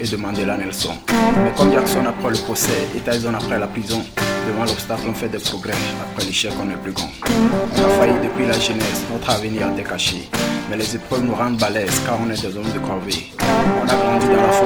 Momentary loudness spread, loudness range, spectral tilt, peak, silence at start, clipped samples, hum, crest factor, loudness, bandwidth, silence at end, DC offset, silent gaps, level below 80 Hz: 8 LU; 3 LU; -4 dB/octave; -2 dBFS; 0 s; under 0.1%; none; 18 dB; -19 LUFS; over 20 kHz; 0 s; under 0.1%; none; -40 dBFS